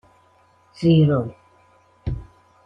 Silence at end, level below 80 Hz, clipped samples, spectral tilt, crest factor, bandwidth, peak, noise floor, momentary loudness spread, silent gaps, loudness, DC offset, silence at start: 0.45 s; -42 dBFS; under 0.1%; -9.5 dB/octave; 18 dB; 6 kHz; -6 dBFS; -57 dBFS; 18 LU; none; -20 LUFS; under 0.1%; 0.8 s